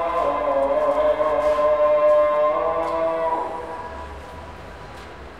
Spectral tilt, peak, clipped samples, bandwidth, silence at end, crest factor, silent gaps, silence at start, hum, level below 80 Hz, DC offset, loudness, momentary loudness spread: -6 dB/octave; -8 dBFS; under 0.1%; 9.6 kHz; 0 s; 12 dB; none; 0 s; none; -46 dBFS; 0.3%; -20 LUFS; 21 LU